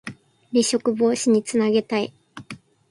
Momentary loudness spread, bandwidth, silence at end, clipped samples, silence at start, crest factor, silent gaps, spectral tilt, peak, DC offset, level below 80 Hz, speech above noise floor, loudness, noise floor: 19 LU; 11.5 kHz; 0.35 s; under 0.1%; 0.05 s; 16 dB; none; -4 dB/octave; -8 dBFS; under 0.1%; -66 dBFS; 22 dB; -21 LUFS; -42 dBFS